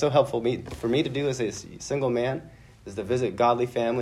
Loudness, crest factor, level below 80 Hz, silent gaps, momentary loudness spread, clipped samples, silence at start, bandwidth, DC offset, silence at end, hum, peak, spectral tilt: -26 LUFS; 18 dB; -54 dBFS; none; 13 LU; under 0.1%; 0 s; 13.5 kHz; under 0.1%; 0 s; none; -8 dBFS; -6 dB/octave